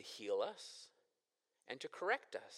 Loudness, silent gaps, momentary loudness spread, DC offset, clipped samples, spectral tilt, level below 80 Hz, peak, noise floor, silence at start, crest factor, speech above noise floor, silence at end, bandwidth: -43 LUFS; none; 15 LU; under 0.1%; under 0.1%; -2 dB/octave; under -90 dBFS; -24 dBFS; -89 dBFS; 0 s; 22 dB; 45 dB; 0 s; 14 kHz